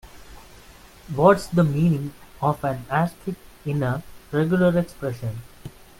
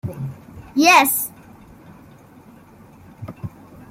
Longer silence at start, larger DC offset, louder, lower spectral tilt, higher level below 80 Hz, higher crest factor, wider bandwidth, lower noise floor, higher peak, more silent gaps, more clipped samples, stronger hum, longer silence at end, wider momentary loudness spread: about the same, 0.05 s vs 0.05 s; neither; second, -23 LUFS vs -16 LUFS; first, -8 dB/octave vs -3 dB/octave; first, -48 dBFS vs -54 dBFS; about the same, 20 dB vs 22 dB; about the same, 16.5 kHz vs 16.5 kHz; about the same, -47 dBFS vs -46 dBFS; about the same, -2 dBFS vs 0 dBFS; neither; neither; neither; about the same, 0.3 s vs 0.4 s; second, 16 LU vs 26 LU